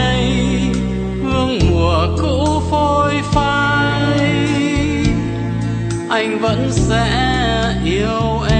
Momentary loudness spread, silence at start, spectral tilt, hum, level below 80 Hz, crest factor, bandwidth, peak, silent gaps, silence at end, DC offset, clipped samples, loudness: 5 LU; 0 s; -6 dB/octave; none; -26 dBFS; 14 dB; 9.4 kHz; 0 dBFS; none; 0 s; under 0.1%; under 0.1%; -16 LUFS